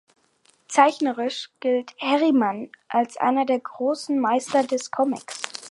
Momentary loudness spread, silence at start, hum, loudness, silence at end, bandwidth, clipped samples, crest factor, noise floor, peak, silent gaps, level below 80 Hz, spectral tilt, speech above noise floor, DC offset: 9 LU; 0.7 s; none; -23 LUFS; 0.05 s; 11.5 kHz; under 0.1%; 20 dB; -62 dBFS; -4 dBFS; none; -78 dBFS; -3.5 dB/octave; 40 dB; under 0.1%